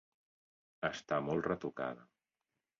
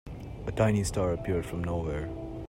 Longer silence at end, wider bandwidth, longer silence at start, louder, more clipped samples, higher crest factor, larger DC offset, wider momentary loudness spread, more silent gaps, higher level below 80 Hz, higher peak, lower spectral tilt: first, 0.75 s vs 0 s; second, 7.2 kHz vs 16 kHz; first, 0.8 s vs 0.05 s; second, -38 LUFS vs -31 LUFS; neither; about the same, 20 dB vs 20 dB; neither; second, 7 LU vs 11 LU; neither; second, -70 dBFS vs -44 dBFS; second, -20 dBFS vs -12 dBFS; second, -4.5 dB/octave vs -6.5 dB/octave